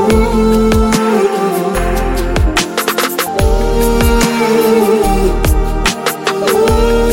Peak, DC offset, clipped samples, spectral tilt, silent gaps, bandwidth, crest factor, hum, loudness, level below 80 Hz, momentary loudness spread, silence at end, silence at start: 0 dBFS; under 0.1%; under 0.1%; -5 dB/octave; none; 17 kHz; 12 dB; none; -12 LUFS; -18 dBFS; 5 LU; 0 s; 0 s